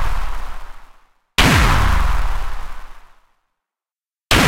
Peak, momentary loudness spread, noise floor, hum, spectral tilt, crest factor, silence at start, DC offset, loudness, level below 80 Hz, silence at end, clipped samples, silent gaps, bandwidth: 0 dBFS; 22 LU; under -90 dBFS; none; -4 dB/octave; 18 dB; 0 s; under 0.1%; -17 LUFS; -22 dBFS; 0 s; under 0.1%; none; 16 kHz